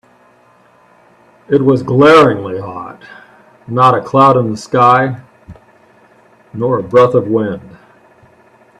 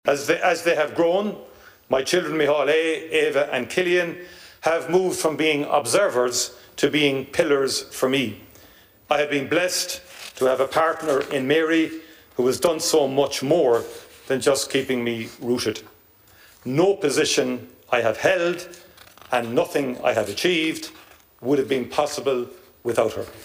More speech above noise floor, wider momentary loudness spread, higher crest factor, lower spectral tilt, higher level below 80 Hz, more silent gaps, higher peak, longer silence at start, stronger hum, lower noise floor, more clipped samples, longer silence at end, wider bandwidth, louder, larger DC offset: first, 38 dB vs 32 dB; first, 19 LU vs 10 LU; about the same, 14 dB vs 18 dB; first, -7 dB/octave vs -3.5 dB/octave; first, -52 dBFS vs -60 dBFS; neither; first, 0 dBFS vs -4 dBFS; first, 1.5 s vs 0.05 s; neither; second, -48 dBFS vs -53 dBFS; neither; first, 1.1 s vs 0 s; second, 11.5 kHz vs 15.5 kHz; first, -11 LUFS vs -22 LUFS; neither